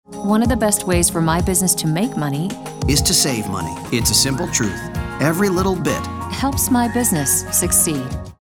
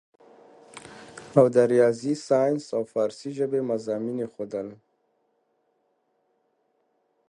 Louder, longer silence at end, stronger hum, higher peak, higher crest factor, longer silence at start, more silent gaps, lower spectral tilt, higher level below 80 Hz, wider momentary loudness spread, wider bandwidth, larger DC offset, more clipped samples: first, -17 LUFS vs -24 LUFS; second, 0.1 s vs 2.55 s; neither; about the same, -2 dBFS vs -2 dBFS; second, 16 dB vs 24 dB; second, 0.1 s vs 0.75 s; neither; second, -3.5 dB/octave vs -6.5 dB/octave; first, -32 dBFS vs -72 dBFS; second, 10 LU vs 24 LU; first, 18 kHz vs 10.5 kHz; neither; neither